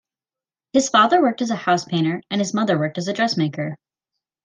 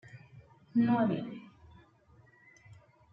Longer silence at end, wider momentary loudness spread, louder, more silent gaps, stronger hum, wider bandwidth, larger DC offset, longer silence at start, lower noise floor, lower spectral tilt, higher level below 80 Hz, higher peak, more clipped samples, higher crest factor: first, 0.7 s vs 0.4 s; second, 9 LU vs 25 LU; first, -20 LUFS vs -31 LUFS; neither; neither; first, 10 kHz vs 5 kHz; neither; first, 0.75 s vs 0.15 s; first, under -90 dBFS vs -63 dBFS; second, -5 dB/octave vs -9 dB/octave; about the same, -68 dBFS vs -70 dBFS; first, -4 dBFS vs -18 dBFS; neither; about the same, 18 dB vs 18 dB